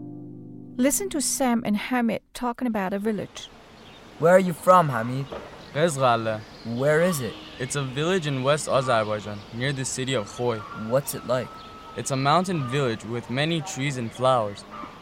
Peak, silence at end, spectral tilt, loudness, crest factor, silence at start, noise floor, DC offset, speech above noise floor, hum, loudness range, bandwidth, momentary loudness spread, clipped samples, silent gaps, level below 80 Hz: -4 dBFS; 0 s; -4.5 dB/octave; -24 LUFS; 20 dB; 0 s; -47 dBFS; under 0.1%; 23 dB; none; 4 LU; 16.5 kHz; 16 LU; under 0.1%; none; -56 dBFS